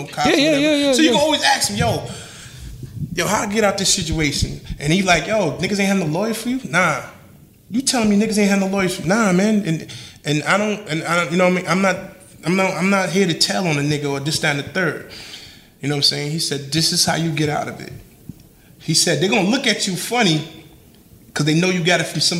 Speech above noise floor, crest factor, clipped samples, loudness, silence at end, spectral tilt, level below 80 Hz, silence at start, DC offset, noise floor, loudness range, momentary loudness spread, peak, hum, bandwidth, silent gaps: 29 dB; 18 dB; under 0.1%; -18 LUFS; 0 s; -4 dB/octave; -44 dBFS; 0 s; under 0.1%; -47 dBFS; 2 LU; 15 LU; 0 dBFS; none; 16 kHz; none